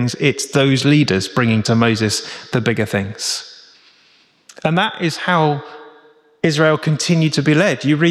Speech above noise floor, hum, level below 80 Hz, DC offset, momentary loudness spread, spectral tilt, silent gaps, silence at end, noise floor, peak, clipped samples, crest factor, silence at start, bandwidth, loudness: 38 dB; none; -56 dBFS; under 0.1%; 8 LU; -5 dB/octave; none; 0 s; -54 dBFS; -2 dBFS; under 0.1%; 16 dB; 0 s; 13.5 kHz; -16 LUFS